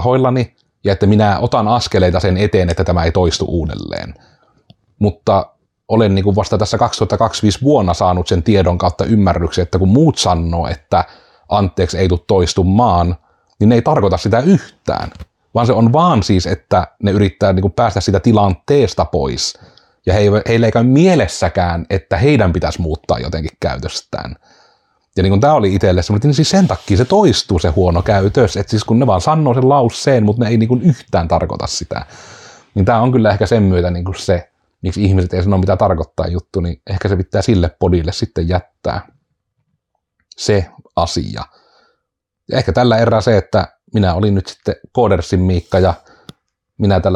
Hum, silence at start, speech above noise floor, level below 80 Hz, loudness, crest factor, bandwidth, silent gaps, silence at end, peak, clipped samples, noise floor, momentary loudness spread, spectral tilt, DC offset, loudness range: none; 0 s; 63 dB; -36 dBFS; -14 LUFS; 12 dB; 10.5 kHz; none; 0 s; -2 dBFS; under 0.1%; -76 dBFS; 10 LU; -6.5 dB/octave; under 0.1%; 5 LU